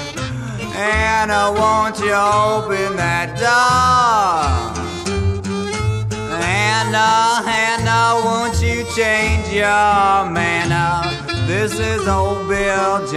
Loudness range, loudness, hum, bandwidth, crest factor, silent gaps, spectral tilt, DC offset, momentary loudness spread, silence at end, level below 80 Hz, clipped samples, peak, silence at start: 2 LU; -16 LUFS; none; 13.5 kHz; 14 dB; none; -4.5 dB/octave; under 0.1%; 8 LU; 0 s; -32 dBFS; under 0.1%; -2 dBFS; 0 s